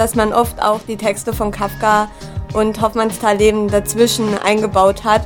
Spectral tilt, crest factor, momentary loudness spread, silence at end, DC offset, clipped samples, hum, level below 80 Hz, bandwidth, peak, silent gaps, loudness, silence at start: -4.5 dB/octave; 14 dB; 7 LU; 0 s; under 0.1%; under 0.1%; none; -34 dBFS; 17.5 kHz; 0 dBFS; none; -16 LUFS; 0 s